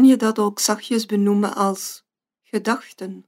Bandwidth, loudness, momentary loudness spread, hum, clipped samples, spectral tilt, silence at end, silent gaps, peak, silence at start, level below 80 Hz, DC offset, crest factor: 16 kHz; -21 LUFS; 12 LU; none; under 0.1%; -4.5 dB/octave; 0.05 s; none; -4 dBFS; 0 s; -76 dBFS; under 0.1%; 16 dB